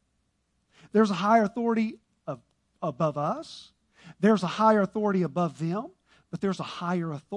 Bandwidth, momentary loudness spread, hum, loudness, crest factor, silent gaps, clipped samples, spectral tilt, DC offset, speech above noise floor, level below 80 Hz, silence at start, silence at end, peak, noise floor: 10.5 kHz; 18 LU; none; -27 LUFS; 20 dB; none; under 0.1%; -7 dB/octave; under 0.1%; 48 dB; -70 dBFS; 0.95 s; 0 s; -8 dBFS; -74 dBFS